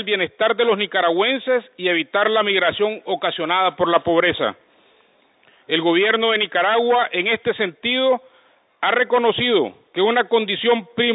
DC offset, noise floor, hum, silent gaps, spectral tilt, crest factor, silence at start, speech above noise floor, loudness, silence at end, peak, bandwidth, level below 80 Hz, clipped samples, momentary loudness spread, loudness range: under 0.1%; -57 dBFS; none; none; -9 dB/octave; 18 dB; 0 s; 39 dB; -19 LUFS; 0 s; -2 dBFS; 4 kHz; -60 dBFS; under 0.1%; 6 LU; 1 LU